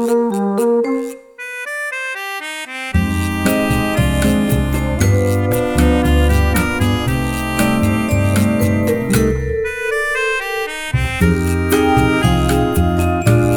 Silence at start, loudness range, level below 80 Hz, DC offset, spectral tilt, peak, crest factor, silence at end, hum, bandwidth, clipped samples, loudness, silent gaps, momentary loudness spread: 0 s; 4 LU; -24 dBFS; under 0.1%; -6 dB/octave; 0 dBFS; 16 dB; 0 s; none; over 20 kHz; under 0.1%; -16 LUFS; none; 8 LU